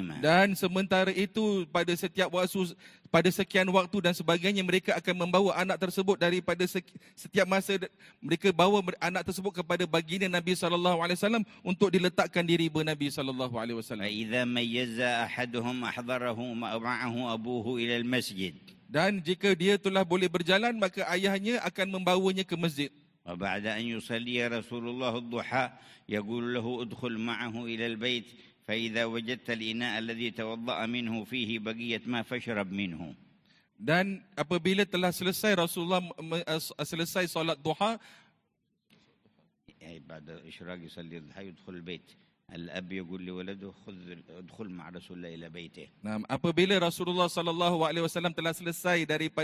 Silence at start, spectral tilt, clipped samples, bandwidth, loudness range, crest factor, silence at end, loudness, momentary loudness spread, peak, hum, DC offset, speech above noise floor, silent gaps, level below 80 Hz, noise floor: 0 s; -5 dB/octave; under 0.1%; 16 kHz; 15 LU; 22 dB; 0 s; -30 LUFS; 18 LU; -8 dBFS; none; under 0.1%; 48 dB; none; -66 dBFS; -78 dBFS